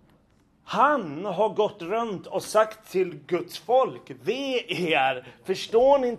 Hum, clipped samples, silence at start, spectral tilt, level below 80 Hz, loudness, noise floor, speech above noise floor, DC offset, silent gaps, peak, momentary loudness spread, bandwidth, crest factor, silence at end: none; under 0.1%; 0.65 s; -4.5 dB/octave; -64 dBFS; -25 LUFS; -62 dBFS; 37 dB; under 0.1%; none; -8 dBFS; 9 LU; 13.5 kHz; 18 dB; 0 s